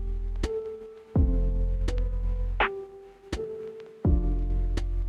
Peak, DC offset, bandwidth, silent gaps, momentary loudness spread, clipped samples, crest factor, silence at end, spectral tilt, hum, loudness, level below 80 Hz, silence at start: -12 dBFS; under 0.1%; 7.6 kHz; none; 13 LU; under 0.1%; 16 dB; 0 s; -7 dB/octave; none; -30 LUFS; -28 dBFS; 0 s